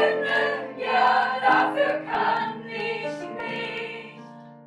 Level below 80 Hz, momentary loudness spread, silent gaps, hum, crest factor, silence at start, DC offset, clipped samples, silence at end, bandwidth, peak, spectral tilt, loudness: -70 dBFS; 14 LU; none; none; 18 dB; 0 s; under 0.1%; under 0.1%; 0 s; 11 kHz; -8 dBFS; -4.5 dB/octave; -24 LUFS